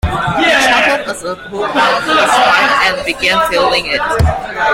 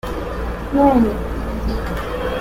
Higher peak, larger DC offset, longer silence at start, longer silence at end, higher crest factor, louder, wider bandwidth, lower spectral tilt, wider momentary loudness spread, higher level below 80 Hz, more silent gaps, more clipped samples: about the same, 0 dBFS vs -2 dBFS; neither; about the same, 0.05 s vs 0.05 s; about the same, 0 s vs 0 s; about the same, 12 dB vs 16 dB; first, -11 LUFS vs -20 LUFS; about the same, 16.5 kHz vs 16.5 kHz; second, -3.5 dB/octave vs -7.5 dB/octave; second, 8 LU vs 12 LU; about the same, -30 dBFS vs -26 dBFS; neither; neither